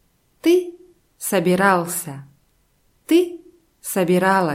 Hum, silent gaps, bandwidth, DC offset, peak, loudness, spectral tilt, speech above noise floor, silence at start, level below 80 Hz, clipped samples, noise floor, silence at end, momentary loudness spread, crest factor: none; none; 16.5 kHz; under 0.1%; -2 dBFS; -19 LUFS; -5 dB/octave; 44 dB; 0.45 s; -64 dBFS; under 0.1%; -62 dBFS; 0 s; 17 LU; 18 dB